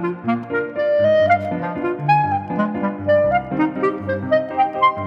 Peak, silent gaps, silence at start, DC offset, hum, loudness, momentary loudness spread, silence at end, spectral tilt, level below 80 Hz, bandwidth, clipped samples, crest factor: -6 dBFS; none; 0 s; under 0.1%; none; -19 LUFS; 8 LU; 0 s; -8.5 dB/octave; -52 dBFS; 6 kHz; under 0.1%; 14 dB